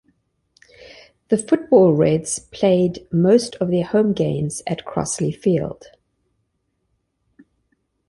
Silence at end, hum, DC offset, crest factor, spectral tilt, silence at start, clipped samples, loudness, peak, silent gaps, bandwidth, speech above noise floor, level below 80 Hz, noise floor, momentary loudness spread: 2.35 s; none; under 0.1%; 18 dB; -6 dB/octave; 1.3 s; under 0.1%; -19 LUFS; -2 dBFS; none; 11.5 kHz; 53 dB; -54 dBFS; -71 dBFS; 10 LU